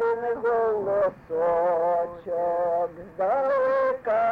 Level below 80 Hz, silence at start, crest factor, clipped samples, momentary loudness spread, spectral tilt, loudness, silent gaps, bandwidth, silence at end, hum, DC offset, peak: -60 dBFS; 0 s; 8 dB; under 0.1%; 5 LU; -7.5 dB/octave; -25 LUFS; none; 5.2 kHz; 0 s; none; under 0.1%; -16 dBFS